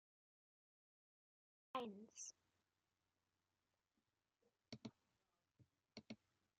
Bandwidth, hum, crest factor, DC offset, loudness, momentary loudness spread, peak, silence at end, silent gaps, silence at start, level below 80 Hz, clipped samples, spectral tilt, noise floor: 7.4 kHz; none; 28 dB; under 0.1%; -56 LUFS; 12 LU; -34 dBFS; 0.45 s; none; 1.75 s; under -90 dBFS; under 0.1%; -3.5 dB/octave; under -90 dBFS